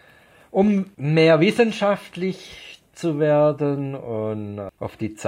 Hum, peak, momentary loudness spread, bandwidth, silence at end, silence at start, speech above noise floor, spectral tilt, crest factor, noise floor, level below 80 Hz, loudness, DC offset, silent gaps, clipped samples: none; -4 dBFS; 17 LU; 12 kHz; 0 s; 0.55 s; 31 dB; -7 dB/octave; 16 dB; -52 dBFS; -60 dBFS; -21 LUFS; under 0.1%; none; under 0.1%